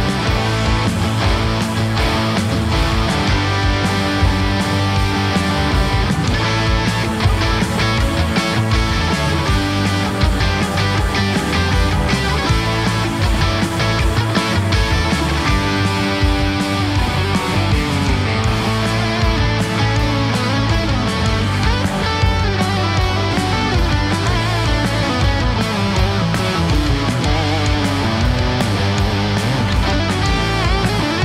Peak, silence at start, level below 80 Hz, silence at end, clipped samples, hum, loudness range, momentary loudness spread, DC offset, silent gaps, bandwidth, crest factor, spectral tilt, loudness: -2 dBFS; 0 s; -24 dBFS; 0 s; under 0.1%; none; 0 LU; 1 LU; under 0.1%; none; 15 kHz; 14 dB; -5.5 dB/octave; -17 LUFS